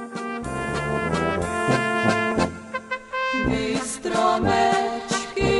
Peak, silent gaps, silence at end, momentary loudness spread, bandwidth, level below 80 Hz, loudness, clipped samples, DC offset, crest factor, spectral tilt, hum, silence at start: -8 dBFS; none; 0 s; 9 LU; 11.5 kHz; -42 dBFS; -23 LUFS; under 0.1%; under 0.1%; 16 dB; -4.5 dB/octave; none; 0 s